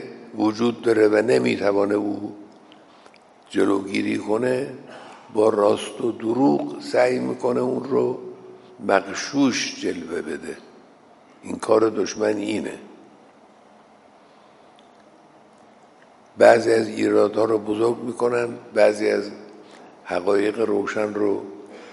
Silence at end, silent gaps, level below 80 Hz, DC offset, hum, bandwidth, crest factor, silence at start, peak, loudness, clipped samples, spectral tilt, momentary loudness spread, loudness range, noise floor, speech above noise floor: 0 s; none; -68 dBFS; under 0.1%; none; 11.5 kHz; 22 dB; 0 s; 0 dBFS; -21 LUFS; under 0.1%; -5 dB/octave; 16 LU; 5 LU; -51 dBFS; 31 dB